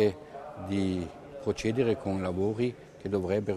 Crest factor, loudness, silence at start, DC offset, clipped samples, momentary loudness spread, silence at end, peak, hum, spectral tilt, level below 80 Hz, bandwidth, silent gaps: 18 dB; -31 LUFS; 0 s; under 0.1%; under 0.1%; 13 LU; 0 s; -12 dBFS; none; -7 dB/octave; -58 dBFS; 12 kHz; none